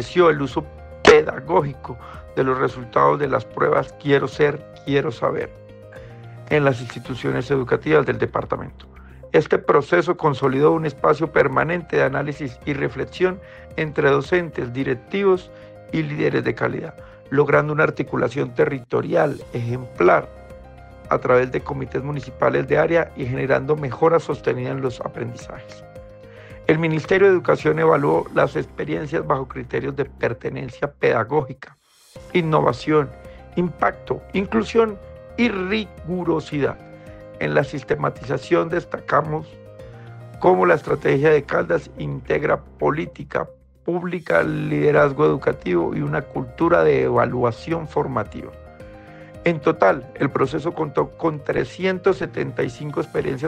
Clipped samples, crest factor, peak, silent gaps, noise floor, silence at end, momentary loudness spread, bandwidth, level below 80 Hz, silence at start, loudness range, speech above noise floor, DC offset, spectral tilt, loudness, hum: under 0.1%; 20 dB; -2 dBFS; none; -41 dBFS; 0 s; 14 LU; 9.4 kHz; -46 dBFS; 0 s; 4 LU; 21 dB; under 0.1%; -7 dB/octave; -21 LUFS; none